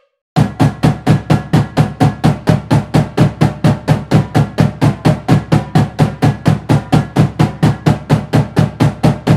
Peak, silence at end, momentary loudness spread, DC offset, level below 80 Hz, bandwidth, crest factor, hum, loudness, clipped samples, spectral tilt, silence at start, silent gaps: 0 dBFS; 0 s; 3 LU; under 0.1%; -32 dBFS; 13 kHz; 12 dB; none; -13 LUFS; 0.5%; -7.5 dB/octave; 0.35 s; none